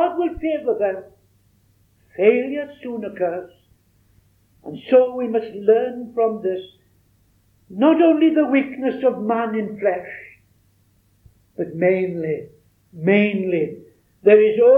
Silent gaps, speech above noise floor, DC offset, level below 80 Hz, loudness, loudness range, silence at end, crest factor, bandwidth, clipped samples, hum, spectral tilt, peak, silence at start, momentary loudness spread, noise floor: none; 41 dB; under 0.1%; -56 dBFS; -19 LUFS; 5 LU; 0 s; 18 dB; 4.2 kHz; under 0.1%; none; -9 dB/octave; -2 dBFS; 0 s; 16 LU; -60 dBFS